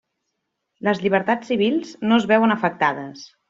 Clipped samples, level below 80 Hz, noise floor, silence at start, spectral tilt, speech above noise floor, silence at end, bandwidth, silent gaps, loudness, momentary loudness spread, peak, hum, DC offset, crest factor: under 0.1%; -64 dBFS; -77 dBFS; 0.85 s; -6 dB/octave; 57 dB; 0.25 s; 7.6 kHz; none; -20 LUFS; 8 LU; -4 dBFS; none; under 0.1%; 18 dB